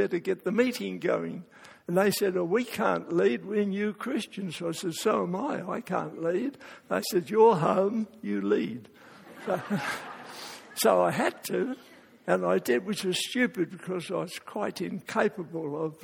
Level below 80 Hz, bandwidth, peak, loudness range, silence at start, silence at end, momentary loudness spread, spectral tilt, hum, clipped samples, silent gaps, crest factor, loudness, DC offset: -74 dBFS; 17.5 kHz; -10 dBFS; 4 LU; 0 s; 0.1 s; 11 LU; -5 dB/octave; none; under 0.1%; none; 20 dB; -29 LUFS; under 0.1%